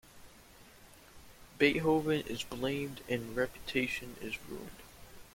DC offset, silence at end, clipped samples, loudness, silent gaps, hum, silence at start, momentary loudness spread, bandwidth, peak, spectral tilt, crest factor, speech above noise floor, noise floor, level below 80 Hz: under 0.1%; 0.05 s; under 0.1%; -34 LUFS; none; none; 0.05 s; 19 LU; 16.5 kHz; -14 dBFS; -5 dB/octave; 22 dB; 23 dB; -57 dBFS; -58 dBFS